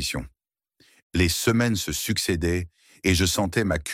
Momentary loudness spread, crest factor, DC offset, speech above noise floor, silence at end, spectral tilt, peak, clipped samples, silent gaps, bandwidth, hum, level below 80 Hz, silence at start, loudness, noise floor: 9 LU; 18 dB; under 0.1%; 41 dB; 0 s; -4 dB/octave; -6 dBFS; under 0.1%; 1.02-1.10 s; 16.5 kHz; none; -40 dBFS; 0 s; -24 LUFS; -65 dBFS